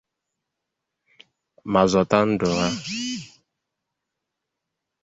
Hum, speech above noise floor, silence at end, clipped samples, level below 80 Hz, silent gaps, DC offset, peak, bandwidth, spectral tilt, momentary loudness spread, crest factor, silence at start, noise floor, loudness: none; 62 dB; 1.75 s; under 0.1%; -54 dBFS; none; under 0.1%; -2 dBFS; 8 kHz; -5 dB/octave; 13 LU; 24 dB; 1.65 s; -83 dBFS; -22 LUFS